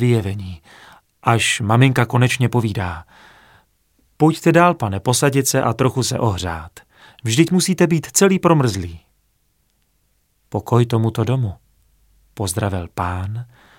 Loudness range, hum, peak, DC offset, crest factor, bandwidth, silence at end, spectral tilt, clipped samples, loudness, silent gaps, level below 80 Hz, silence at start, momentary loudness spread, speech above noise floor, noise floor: 5 LU; none; 0 dBFS; under 0.1%; 18 dB; 17 kHz; 0.35 s; -5 dB/octave; under 0.1%; -18 LUFS; none; -48 dBFS; 0 s; 14 LU; 47 dB; -64 dBFS